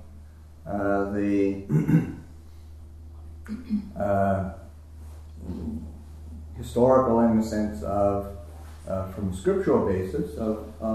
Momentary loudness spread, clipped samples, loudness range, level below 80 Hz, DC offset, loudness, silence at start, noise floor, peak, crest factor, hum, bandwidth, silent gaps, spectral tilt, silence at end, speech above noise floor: 23 LU; under 0.1%; 6 LU; -44 dBFS; under 0.1%; -25 LUFS; 0 s; -45 dBFS; -8 dBFS; 18 dB; none; 13.5 kHz; none; -8.5 dB/octave; 0 s; 22 dB